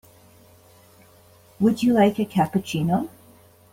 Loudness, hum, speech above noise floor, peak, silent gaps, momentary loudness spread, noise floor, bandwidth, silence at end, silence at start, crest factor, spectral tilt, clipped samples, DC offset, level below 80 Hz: -22 LUFS; none; 32 dB; -6 dBFS; none; 7 LU; -53 dBFS; 16.5 kHz; 0.65 s; 1.6 s; 18 dB; -7 dB/octave; under 0.1%; under 0.1%; -60 dBFS